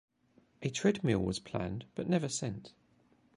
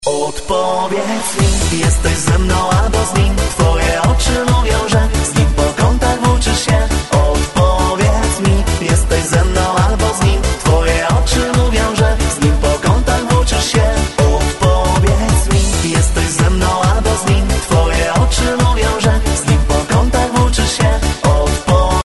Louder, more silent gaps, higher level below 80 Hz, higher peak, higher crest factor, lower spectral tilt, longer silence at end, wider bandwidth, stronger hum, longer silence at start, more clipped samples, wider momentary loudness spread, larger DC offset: second, -34 LUFS vs -14 LUFS; neither; second, -58 dBFS vs -16 dBFS; second, -14 dBFS vs 0 dBFS; first, 20 dB vs 12 dB; about the same, -5.5 dB/octave vs -5 dB/octave; first, 0.65 s vs 0.05 s; about the same, 11 kHz vs 12 kHz; neither; first, 0.6 s vs 0 s; neither; first, 10 LU vs 2 LU; neither